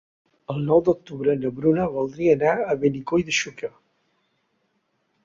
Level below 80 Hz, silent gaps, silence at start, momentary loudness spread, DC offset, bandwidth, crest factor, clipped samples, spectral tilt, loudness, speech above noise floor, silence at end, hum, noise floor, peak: -56 dBFS; none; 0.5 s; 12 LU; under 0.1%; 7.6 kHz; 18 dB; under 0.1%; -5.5 dB/octave; -22 LUFS; 49 dB; 1.55 s; none; -71 dBFS; -4 dBFS